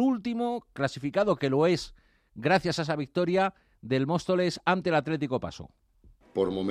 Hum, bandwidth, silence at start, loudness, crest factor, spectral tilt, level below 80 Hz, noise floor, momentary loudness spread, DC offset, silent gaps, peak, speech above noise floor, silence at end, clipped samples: none; 13.5 kHz; 0 s; -28 LUFS; 18 dB; -6 dB/octave; -60 dBFS; -59 dBFS; 7 LU; under 0.1%; none; -10 dBFS; 31 dB; 0 s; under 0.1%